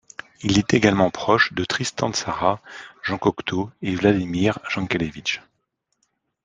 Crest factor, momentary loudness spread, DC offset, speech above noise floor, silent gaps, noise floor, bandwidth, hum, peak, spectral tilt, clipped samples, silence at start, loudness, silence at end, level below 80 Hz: 20 dB; 10 LU; under 0.1%; 52 dB; none; -74 dBFS; 9.8 kHz; none; -2 dBFS; -5 dB/octave; under 0.1%; 0.4 s; -22 LUFS; 1.05 s; -52 dBFS